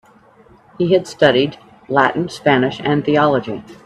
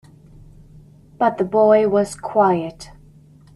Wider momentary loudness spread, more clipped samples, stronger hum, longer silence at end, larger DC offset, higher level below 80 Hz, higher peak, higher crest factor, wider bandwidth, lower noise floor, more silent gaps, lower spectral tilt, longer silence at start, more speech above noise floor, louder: about the same, 7 LU vs 8 LU; neither; neither; second, 0.1 s vs 0.7 s; neither; about the same, -54 dBFS vs -52 dBFS; about the same, 0 dBFS vs -2 dBFS; about the same, 16 dB vs 18 dB; about the same, 12 kHz vs 12 kHz; about the same, -48 dBFS vs -47 dBFS; neither; about the same, -6 dB/octave vs -6.5 dB/octave; second, 0.8 s vs 1.2 s; about the same, 32 dB vs 30 dB; about the same, -16 LUFS vs -17 LUFS